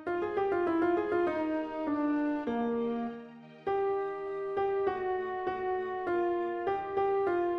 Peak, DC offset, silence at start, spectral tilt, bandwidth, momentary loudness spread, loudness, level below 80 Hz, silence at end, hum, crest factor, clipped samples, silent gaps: -18 dBFS; under 0.1%; 0 s; -7.5 dB/octave; 5.8 kHz; 6 LU; -32 LUFS; -64 dBFS; 0 s; none; 12 dB; under 0.1%; none